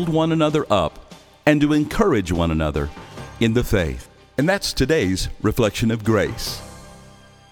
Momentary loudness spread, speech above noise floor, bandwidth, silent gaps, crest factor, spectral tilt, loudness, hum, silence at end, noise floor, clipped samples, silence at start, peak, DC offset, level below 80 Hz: 11 LU; 27 dB; 19.5 kHz; none; 18 dB; -5.5 dB/octave; -20 LUFS; none; 0.5 s; -46 dBFS; under 0.1%; 0 s; -2 dBFS; under 0.1%; -36 dBFS